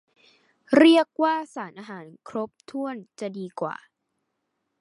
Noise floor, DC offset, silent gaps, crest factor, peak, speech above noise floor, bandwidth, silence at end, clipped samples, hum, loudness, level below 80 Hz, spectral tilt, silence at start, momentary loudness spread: -78 dBFS; under 0.1%; none; 22 dB; -4 dBFS; 55 dB; 11.5 kHz; 1.1 s; under 0.1%; none; -23 LUFS; -78 dBFS; -5 dB/octave; 0.7 s; 23 LU